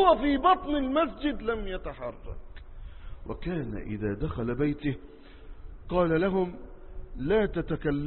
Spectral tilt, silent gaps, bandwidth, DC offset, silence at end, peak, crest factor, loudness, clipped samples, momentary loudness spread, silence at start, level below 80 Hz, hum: -10.5 dB/octave; none; 4.3 kHz; under 0.1%; 0 s; -8 dBFS; 20 dB; -29 LUFS; under 0.1%; 23 LU; 0 s; -42 dBFS; none